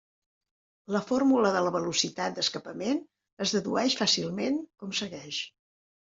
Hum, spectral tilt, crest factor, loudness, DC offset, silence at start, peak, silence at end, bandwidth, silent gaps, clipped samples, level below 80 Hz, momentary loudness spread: none; -3.5 dB/octave; 18 dB; -28 LUFS; under 0.1%; 0.9 s; -10 dBFS; 0.55 s; 7.8 kHz; 3.33-3.37 s; under 0.1%; -70 dBFS; 10 LU